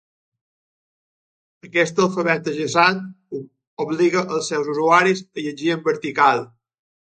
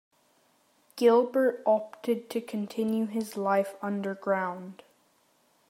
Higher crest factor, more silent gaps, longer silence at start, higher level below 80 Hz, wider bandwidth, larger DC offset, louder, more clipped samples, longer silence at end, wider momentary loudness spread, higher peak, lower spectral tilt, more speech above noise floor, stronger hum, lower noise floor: about the same, 22 dB vs 18 dB; first, 3.67-3.77 s vs none; first, 1.65 s vs 0.95 s; first, -70 dBFS vs -84 dBFS; second, 9.4 kHz vs 16 kHz; neither; first, -19 LUFS vs -28 LUFS; neither; second, 0.7 s vs 0.95 s; first, 16 LU vs 11 LU; first, 0 dBFS vs -10 dBFS; second, -4.5 dB/octave vs -6 dB/octave; first, over 71 dB vs 40 dB; neither; first, under -90 dBFS vs -67 dBFS